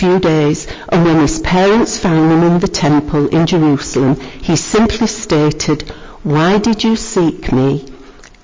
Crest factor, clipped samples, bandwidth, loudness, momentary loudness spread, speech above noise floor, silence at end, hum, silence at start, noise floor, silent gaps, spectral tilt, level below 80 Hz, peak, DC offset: 8 dB; under 0.1%; 7.8 kHz; -13 LUFS; 6 LU; 24 dB; 0.3 s; none; 0 s; -37 dBFS; none; -5.5 dB/octave; -32 dBFS; -4 dBFS; under 0.1%